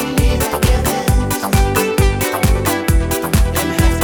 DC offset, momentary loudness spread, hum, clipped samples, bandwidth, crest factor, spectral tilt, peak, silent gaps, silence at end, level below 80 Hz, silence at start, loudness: under 0.1%; 2 LU; none; under 0.1%; 19.5 kHz; 14 dB; -5 dB/octave; 0 dBFS; none; 0 s; -18 dBFS; 0 s; -16 LUFS